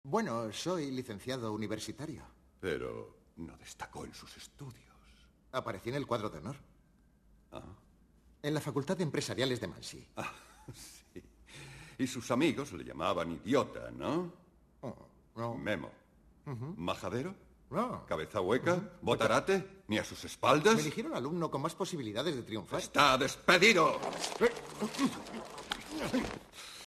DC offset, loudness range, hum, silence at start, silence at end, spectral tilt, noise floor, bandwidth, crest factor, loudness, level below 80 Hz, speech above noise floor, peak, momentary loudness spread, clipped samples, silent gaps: under 0.1%; 13 LU; none; 0.05 s; 0.05 s; -4.5 dB/octave; -66 dBFS; 13.5 kHz; 24 dB; -34 LUFS; -64 dBFS; 32 dB; -12 dBFS; 22 LU; under 0.1%; none